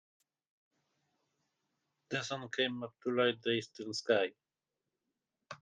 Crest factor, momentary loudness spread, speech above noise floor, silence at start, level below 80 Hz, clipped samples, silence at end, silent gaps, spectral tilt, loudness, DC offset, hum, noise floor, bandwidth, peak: 22 dB; 9 LU; over 55 dB; 2.1 s; -84 dBFS; under 0.1%; 0.05 s; none; -4 dB/octave; -35 LUFS; under 0.1%; none; under -90 dBFS; 9.6 kHz; -16 dBFS